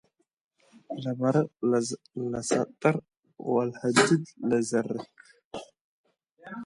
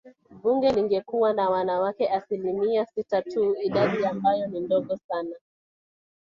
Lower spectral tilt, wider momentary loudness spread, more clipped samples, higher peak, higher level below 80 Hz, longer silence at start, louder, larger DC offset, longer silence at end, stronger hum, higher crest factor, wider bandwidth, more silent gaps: second, -5 dB/octave vs -7.5 dB/octave; first, 19 LU vs 7 LU; neither; first, -4 dBFS vs -10 dBFS; about the same, -68 dBFS vs -64 dBFS; first, 0.9 s vs 0.05 s; about the same, -27 LUFS vs -25 LUFS; neither; second, 0 s vs 0.85 s; neither; first, 24 dB vs 16 dB; first, 11.5 kHz vs 7.2 kHz; first, 3.19-3.23 s, 5.45-5.51 s, 5.81-6.04 s vs 5.04-5.09 s